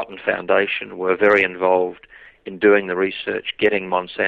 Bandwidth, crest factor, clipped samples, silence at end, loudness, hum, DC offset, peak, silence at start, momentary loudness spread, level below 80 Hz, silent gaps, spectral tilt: 4.9 kHz; 16 dB; under 0.1%; 0 s; -19 LUFS; none; under 0.1%; -4 dBFS; 0 s; 10 LU; -58 dBFS; none; -6.5 dB/octave